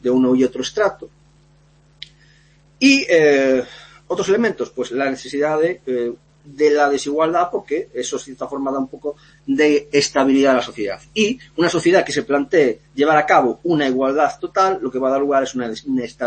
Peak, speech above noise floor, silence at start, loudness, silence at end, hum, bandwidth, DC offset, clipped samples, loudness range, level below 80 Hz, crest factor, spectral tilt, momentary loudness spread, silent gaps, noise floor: -2 dBFS; 35 dB; 0.05 s; -18 LUFS; 0 s; none; 8.8 kHz; under 0.1%; under 0.1%; 4 LU; -56 dBFS; 16 dB; -4 dB/octave; 13 LU; none; -53 dBFS